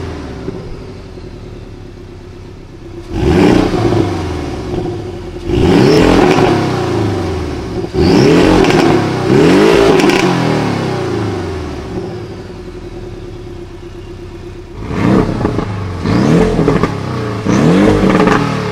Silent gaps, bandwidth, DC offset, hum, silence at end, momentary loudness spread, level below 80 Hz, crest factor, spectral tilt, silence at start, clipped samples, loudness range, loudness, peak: none; 15.5 kHz; under 0.1%; none; 0 s; 22 LU; -28 dBFS; 12 dB; -6.5 dB/octave; 0 s; under 0.1%; 13 LU; -12 LUFS; 0 dBFS